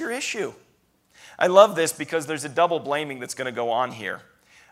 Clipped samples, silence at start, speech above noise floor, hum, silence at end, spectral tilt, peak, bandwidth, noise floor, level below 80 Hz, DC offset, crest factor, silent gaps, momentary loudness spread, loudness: under 0.1%; 0 s; 41 dB; none; 0.5 s; -3.5 dB/octave; -2 dBFS; 15.5 kHz; -64 dBFS; -72 dBFS; under 0.1%; 22 dB; none; 16 LU; -23 LUFS